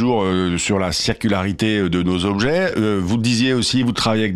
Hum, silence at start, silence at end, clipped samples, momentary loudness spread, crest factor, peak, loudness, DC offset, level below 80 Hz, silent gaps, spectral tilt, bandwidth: none; 0 s; 0 s; under 0.1%; 2 LU; 12 dB; -6 dBFS; -18 LUFS; under 0.1%; -44 dBFS; none; -5 dB/octave; 13.5 kHz